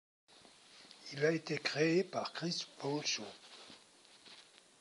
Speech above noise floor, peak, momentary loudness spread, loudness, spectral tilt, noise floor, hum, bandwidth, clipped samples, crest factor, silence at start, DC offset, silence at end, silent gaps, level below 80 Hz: 26 dB; -20 dBFS; 24 LU; -36 LUFS; -4 dB/octave; -63 dBFS; none; 11.5 kHz; under 0.1%; 20 dB; 0.75 s; under 0.1%; 0.4 s; none; -88 dBFS